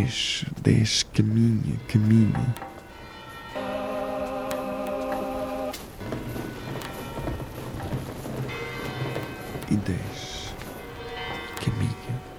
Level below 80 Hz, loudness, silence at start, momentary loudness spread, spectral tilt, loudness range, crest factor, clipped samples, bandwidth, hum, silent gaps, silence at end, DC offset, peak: -46 dBFS; -28 LUFS; 0 s; 14 LU; -5.5 dB/octave; 9 LU; 22 dB; under 0.1%; 16.5 kHz; none; none; 0 s; under 0.1%; -6 dBFS